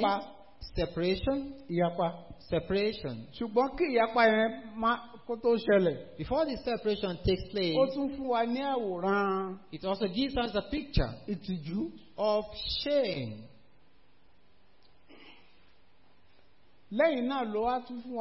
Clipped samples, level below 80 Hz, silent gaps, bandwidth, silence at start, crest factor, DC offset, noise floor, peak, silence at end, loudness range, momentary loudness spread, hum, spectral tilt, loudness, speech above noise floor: under 0.1%; -48 dBFS; none; 5.8 kHz; 0 s; 20 dB; 0.2%; -67 dBFS; -12 dBFS; 0 s; 7 LU; 12 LU; none; -9.5 dB/octave; -31 LUFS; 36 dB